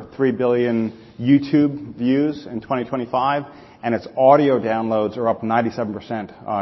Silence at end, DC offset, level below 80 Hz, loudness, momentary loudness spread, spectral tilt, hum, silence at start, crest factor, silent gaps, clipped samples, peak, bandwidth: 0 s; under 0.1%; -56 dBFS; -20 LUFS; 13 LU; -8.5 dB/octave; none; 0 s; 18 dB; none; under 0.1%; 0 dBFS; 6 kHz